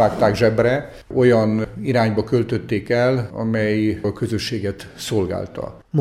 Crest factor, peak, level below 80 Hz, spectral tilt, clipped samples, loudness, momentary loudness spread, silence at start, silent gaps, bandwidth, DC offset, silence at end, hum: 16 dB; -2 dBFS; -46 dBFS; -6.5 dB/octave; under 0.1%; -20 LUFS; 10 LU; 0 s; none; 14.5 kHz; under 0.1%; 0 s; none